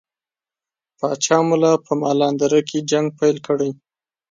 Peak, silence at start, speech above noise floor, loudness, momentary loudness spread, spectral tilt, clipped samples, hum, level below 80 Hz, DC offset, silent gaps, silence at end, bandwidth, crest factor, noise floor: -2 dBFS; 1 s; over 72 dB; -19 LUFS; 6 LU; -5 dB/octave; under 0.1%; none; -68 dBFS; under 0.1%; none; 0.6 s; 9.4 kHz; 18 dB; under -90 dBFS